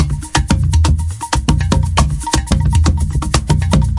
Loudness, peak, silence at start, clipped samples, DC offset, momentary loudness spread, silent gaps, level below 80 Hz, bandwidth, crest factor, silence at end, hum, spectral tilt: -15 LUFS; 0 dBFS; 0 s; under 0.1%; under 0.1%; 4 LU; none; -18 dBFS; 11.5 kHz; 14 dB; 0 s; none; -5 dB/octave